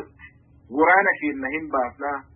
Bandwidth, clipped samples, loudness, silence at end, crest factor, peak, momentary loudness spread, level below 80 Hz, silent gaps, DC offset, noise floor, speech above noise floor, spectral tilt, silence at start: 3.6 kHz; under 0.1%; -21 LUFS; 0.15 s; 18 dB; -4 dBFS; 14 LU; -56 dBFS; none; under 0.1%; -49 dBFS; 27 dB; -9.5 dB/octave; 0 s